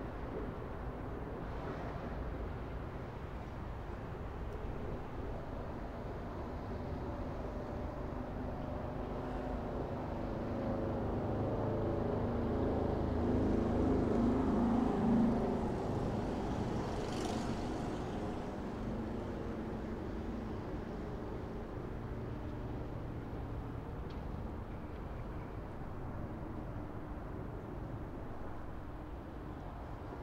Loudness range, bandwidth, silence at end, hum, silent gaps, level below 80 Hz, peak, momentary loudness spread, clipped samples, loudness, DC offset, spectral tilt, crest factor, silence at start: 11 LU; 15 kHz; 0 s; none; none; -46 dBFS; -22 dBFS; 12 LU; under 0.1%; -40 LUFS; under 0.1%; -8 dB/octave; 18 dB; 0 s